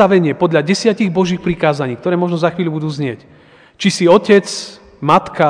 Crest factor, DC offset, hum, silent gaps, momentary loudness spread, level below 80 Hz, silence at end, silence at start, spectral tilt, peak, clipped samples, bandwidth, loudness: 14 dB; under 0.1%; none; none; 12 LU; -50 dBFS; 0 s; 0 s; -5.5 dB/octave; 0 dBFS; 0.3%; 10 kHz; -15 LUFS